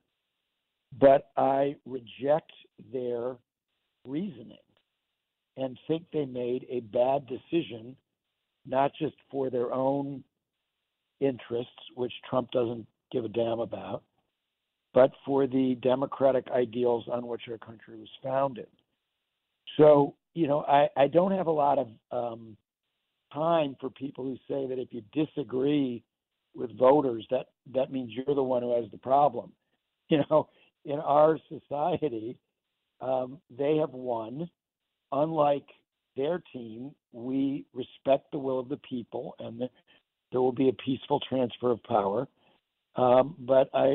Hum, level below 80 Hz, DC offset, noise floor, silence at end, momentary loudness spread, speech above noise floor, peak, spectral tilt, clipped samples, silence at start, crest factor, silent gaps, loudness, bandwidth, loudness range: none; -70 dBFS; under 0.1%; -86 dBFS; 0 s; 17 LU; 58 dB; -10 dBFS; -5.5 dB/octave; under 0.1%; 0.9 s; 18 dB; none; -28 LUFS; 4.2 kHz; 7 LU